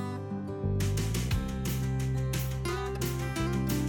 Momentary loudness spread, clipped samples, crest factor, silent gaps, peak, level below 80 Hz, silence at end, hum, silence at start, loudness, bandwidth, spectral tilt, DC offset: 4 LU; under 0.1%; 10 dB; none; -20 dBFS; -38 dBFS; 0 s; none; 0 s; -32 LUFS; 17.5 kHz; -6 dB/octave; under 0.1%